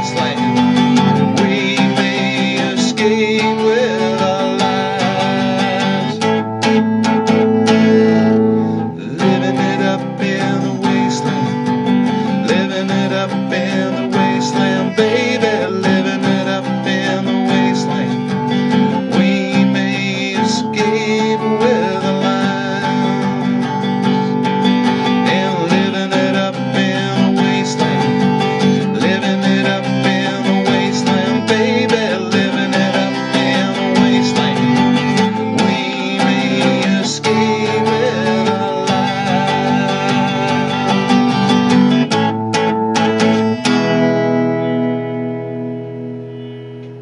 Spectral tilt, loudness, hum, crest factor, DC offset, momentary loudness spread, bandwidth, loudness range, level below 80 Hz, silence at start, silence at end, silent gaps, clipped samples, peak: -5.5 dB/octave; -15 LUFS; none; 14 dB; under 0.1%; 4 LU; 11 kHz; 2 LU; -56 dBFS; 0 s; 0 s; none; under 0.1%; 0 dBFS